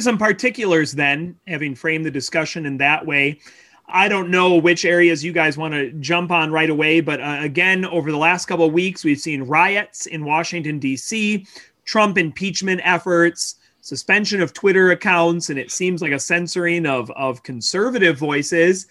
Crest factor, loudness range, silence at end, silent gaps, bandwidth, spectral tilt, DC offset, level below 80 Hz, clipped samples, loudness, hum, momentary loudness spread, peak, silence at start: 16 dB; 3 LU; 0.05 s; none; 12.5 kHz; -4 dB/octave; under 0.1%; -64 dBFS; under 0.1%; -18 LUFS; none; 9 LU; -2 dBFS; 0 s